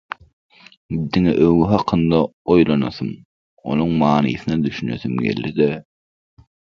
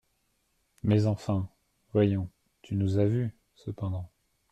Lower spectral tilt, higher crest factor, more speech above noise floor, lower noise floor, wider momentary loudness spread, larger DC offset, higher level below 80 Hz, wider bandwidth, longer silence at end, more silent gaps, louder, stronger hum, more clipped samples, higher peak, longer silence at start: about the same, -8.5 dB/octave vs -9 dB/octave; about the same, 18 dB vs 16 dB; first, over 73 dB vs 47 dB; first, under -90 dBFS vs -74 dBFS; about the same, 14 LU vs 15 LU; neither; first, -44 dBFS vs -60 dBFS; second, 6.8 kHz vs 8.4 kHz; first, 0.95 s vs 0.45 s; first, 2.33-2.45 s, 3.25-3.57 s vs none; first, -18 LUFS vs -29 LUFS; neither; neither; first, 0 dBFS vs -14 dBFS; about the same, 0.9 s vs 0.85 s